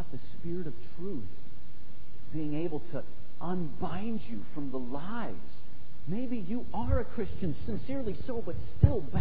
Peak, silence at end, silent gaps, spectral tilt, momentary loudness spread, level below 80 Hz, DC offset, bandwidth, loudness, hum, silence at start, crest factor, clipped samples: -8 dBFS; 0 s; none; -11 dB/octave; 21 LU; -44 dBFS; 7%; 5 kHz; -36 LUFS; none; 0 s; 26 dB; under 0.1%